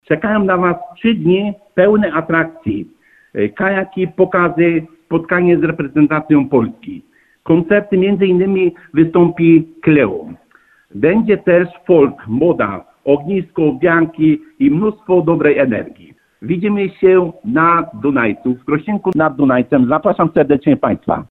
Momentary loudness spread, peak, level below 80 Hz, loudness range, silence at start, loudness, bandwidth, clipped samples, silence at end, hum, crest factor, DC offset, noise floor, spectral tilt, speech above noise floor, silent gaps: 8 LU; 0 dBFS; -48 dBFS; 2 LU; 0.1 s; -14 LUFS; 4 kHz; under 0.1%; 0.1 s; none; 14 dB; under 0.1%; -51 dBFS; -10 dB/octave; 38 dB; none